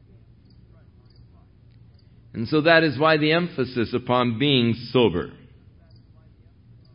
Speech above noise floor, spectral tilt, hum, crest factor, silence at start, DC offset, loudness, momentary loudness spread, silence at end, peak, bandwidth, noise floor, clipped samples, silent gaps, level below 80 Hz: 31 dB; -10.5 dB/octave; none; 22 dB; 2.35 s; under 0.1%; -21 LUFS; 13 LU; 1.6 s; -2 dBFS; 5.4 kHz; -52 dBFS; under 0.1%; none; -54 dBFS